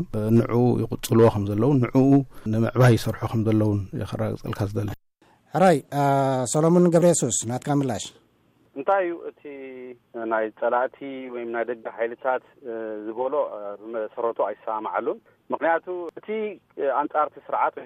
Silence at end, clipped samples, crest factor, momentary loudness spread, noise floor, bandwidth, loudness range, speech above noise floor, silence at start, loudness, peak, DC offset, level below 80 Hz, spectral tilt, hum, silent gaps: 0 s; under 0.1%; 16 dB; 15 LU; -62 dBFS; 15.5 kHz; 8 LU; 39 dB; 0 s; -23 LUFS; -8 dBFS; under 0.1%; -50 dBFS; -6.5 dB/octave; none; none